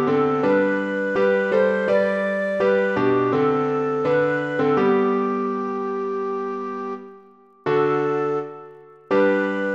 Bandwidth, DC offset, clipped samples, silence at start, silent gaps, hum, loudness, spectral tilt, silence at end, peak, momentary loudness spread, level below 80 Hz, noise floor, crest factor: 7.8 kHz; under 0.1%; under 0.1%; 0 s; none; none; -21 LUFS; -7.5 dB/octave; 0 s; -8 dBFS; 9 LU; -64 dBFS; -50 dBFS; 14 dB